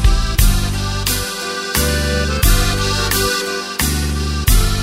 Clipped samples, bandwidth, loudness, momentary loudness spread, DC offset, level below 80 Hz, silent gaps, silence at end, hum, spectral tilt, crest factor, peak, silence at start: under 0.1%; 16.5 kHz; -17 LUFS; 4 LU; under 0.1%; -18 dBFS; none; 0 s; none; -3.5 dB/octave; 16 dB; 0 dBFS; 0 s